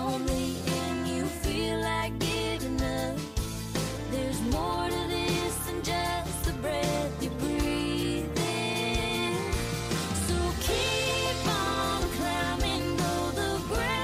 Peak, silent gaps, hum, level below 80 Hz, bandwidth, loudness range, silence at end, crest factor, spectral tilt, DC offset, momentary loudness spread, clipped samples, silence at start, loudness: -18 dBFS; none; none; -40 dBFS; 16 kHz; 2 LU; 0 s; 12 dB; -4.5 dB/octave; under 0.1%; 4 LU; under 0.1%; 0 s; -29 LUFS